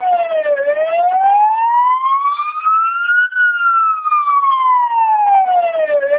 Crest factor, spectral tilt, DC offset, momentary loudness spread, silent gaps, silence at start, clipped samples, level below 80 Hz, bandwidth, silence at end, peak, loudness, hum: 10 dB; -3.5 dB/octave; under 0.1%; 4 LU; none; 0 s; under 0.1%; -72 dBFS; 4 kHz; 0 s; -4 dBFS; -13 LUFS; none